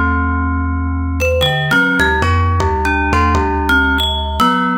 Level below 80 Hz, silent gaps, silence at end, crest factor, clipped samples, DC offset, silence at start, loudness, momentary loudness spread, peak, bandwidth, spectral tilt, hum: -22 dBFS; none; 0 s; 14 dB; under 0.1%; under 0.1%; 0 s; -14 LUFS; 5 LU; 0 dBFS; 17 kHz; -5.5 dB/octave; none